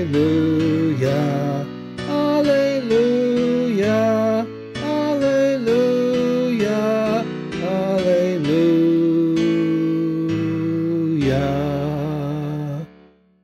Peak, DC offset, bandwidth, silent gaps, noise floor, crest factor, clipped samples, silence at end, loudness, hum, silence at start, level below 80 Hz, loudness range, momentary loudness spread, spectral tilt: -6 dBFS; under 0.1%; 13 kHz; none; -51 dBFS; 12 dB; under 0.1%; 0.55 s; -19 LUFS; none; 0 s; -48 dBFS; 2 LU; 8 LU; -7.5 dB/octave